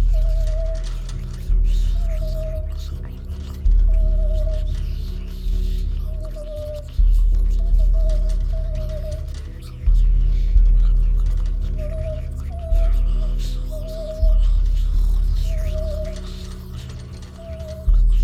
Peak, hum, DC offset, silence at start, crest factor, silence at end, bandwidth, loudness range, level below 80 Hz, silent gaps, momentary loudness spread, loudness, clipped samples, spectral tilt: -4 dBFS; none; under 0.1%; 0 s; 14 dB; 0 s; 6.6 kHz; 3 LU; -18 dBFS; none; 12 LU; -24 LUFS; under 0.1%; -7 dB/octave